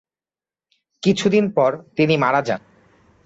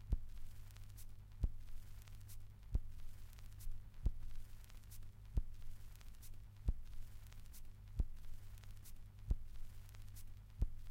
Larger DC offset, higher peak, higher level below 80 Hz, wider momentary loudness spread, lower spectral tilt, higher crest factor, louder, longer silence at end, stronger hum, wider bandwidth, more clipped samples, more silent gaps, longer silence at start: neither; first, -4 dBFS vs -24 dBFS; second, -60 dBFS vs -46 dBFS; second, 7 LU vs 12 LU; about the same, -6 dB/octave vs -6 dB/octave; about the same, 16 dB vs 20 dB; first, -19 LUFS vs -52 LUFS; first, 0.7 s vs 0 s; second, none vs 50 Hz at -60 dBFS; second, 8 kHz vs 16.5 kHz; neither; neither; first, 1.05 s vs 0 s